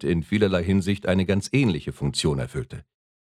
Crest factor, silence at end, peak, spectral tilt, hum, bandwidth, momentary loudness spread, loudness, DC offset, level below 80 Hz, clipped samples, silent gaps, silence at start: 16 dB; 0.5 s; -8 dBFS; -6 dB/octave; none; 13 kHz; 11 LU; -24 LUFS; under 0.1%; -44 dBFS; under 0.1%; none; 0 s